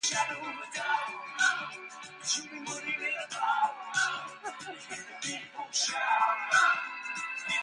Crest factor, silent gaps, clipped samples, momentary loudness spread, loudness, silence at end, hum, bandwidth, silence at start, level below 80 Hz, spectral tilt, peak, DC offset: 20 dB; none; under 0.1%; 14 LU; -31 LUFS; 0 s; none; 11.5 kHz; 0 s; -82 dBFS; 0.5 dB/octave; -12 dBFS; under 0.1%